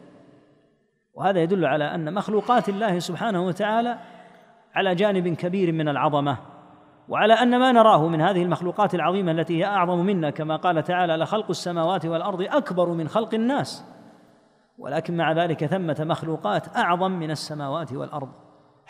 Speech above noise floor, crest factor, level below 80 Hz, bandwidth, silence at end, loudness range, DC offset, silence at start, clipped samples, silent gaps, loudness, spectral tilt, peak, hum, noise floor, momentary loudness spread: 43 dB; 20 dB; -72 dBFS; 14.5 kHz; 0.6 s; 6 LU; under 0.1%; 1.15 s; under 0.1%; none; -23 LUFS; -6.5 dB/octave; -4 dBFS; none; -66 dBFS; 11 LU